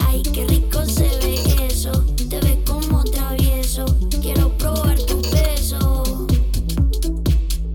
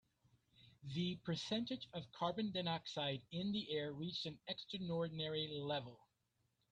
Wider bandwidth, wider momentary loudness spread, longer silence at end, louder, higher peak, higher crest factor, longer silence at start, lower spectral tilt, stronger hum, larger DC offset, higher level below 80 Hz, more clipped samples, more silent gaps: first, 19.5 kHz vs 9.4 kHz; second, 2 LU vs 6 LU; second, 0 s vs 0.75 s; first, -19 LUFS vs -43 LUFS; first, -4 dBFS vs -26 dBFS; second, 12 dB vs 18 dB; second, 0 s vs 0.6 s; about the same, -5.5 dB/octave vs -6 dB/octave; neither; neither; first, -18 dBFS vs -76 dBFS; neither; neither